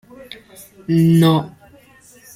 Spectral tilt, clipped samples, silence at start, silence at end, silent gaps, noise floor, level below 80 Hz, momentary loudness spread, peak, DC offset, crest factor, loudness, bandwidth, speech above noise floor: -7.5 dB/octave; under 0.1%; 0.9 s; 0.9 s; none; -48 dBFS; -54 dBFS; 25 LU; -4 dBFS; under 0.1%; 14 dB; -15 LUFS; 16 kHz; 32 dB